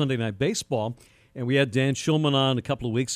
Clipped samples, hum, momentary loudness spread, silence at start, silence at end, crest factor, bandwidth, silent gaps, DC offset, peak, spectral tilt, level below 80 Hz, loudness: under 0.1%; none; 12 LU; 0 s; 0 s; 16 dB; 14 kHz; none; under 0.1%; -8 dBFS; -5 dB/octave; -56 dBFS; -25 LUFS